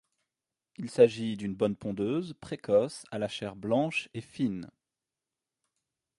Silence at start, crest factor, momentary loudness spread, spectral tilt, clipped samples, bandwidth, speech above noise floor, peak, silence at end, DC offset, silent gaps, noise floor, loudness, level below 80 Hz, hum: 0.8 s; 24 dB; 16 LU; -6 dB/octave; under 0.1%; 11.5 kHz; 60 dB; -8 dBFS; 1.5 s; under 0.1%; none; -90 dBFS; -30 LUFS; -66 dBFS; none